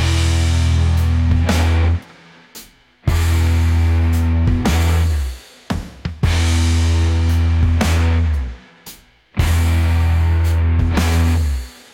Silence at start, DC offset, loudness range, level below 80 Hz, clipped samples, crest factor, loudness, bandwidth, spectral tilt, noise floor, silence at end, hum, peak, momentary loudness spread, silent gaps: 0 s; under 0.1%; 1 LU; -24 dBFS; under 0.1%; 10 dB; -17 LUFS; 15.5 kHz; -6 dB/octave; -44 dBFS; 0.25 s; none; -4 dBFS; 11 LU; none